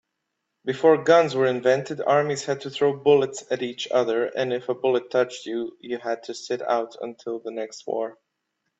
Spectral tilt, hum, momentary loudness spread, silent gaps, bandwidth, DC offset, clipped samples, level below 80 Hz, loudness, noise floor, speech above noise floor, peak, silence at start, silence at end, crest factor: -5 dB/octave; none; 13 LU; none; 8 kHz; under 0.1%; under 0.1%; -70 dBFS; -24 LUFS; -79 dBFS; 56 dB; -4 dBFS; 0.65 s; 0.65 s; 20 dB